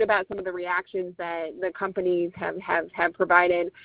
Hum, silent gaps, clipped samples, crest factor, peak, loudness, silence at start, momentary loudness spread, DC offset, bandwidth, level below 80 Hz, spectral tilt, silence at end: none; none; under 0.1%; 22 dB; -4 dBFS; -26 LUFS; 0 s; 12 LU; under 0.1%; 4 kHz; -62 dBFS; -8.5 dB/octave; 0 s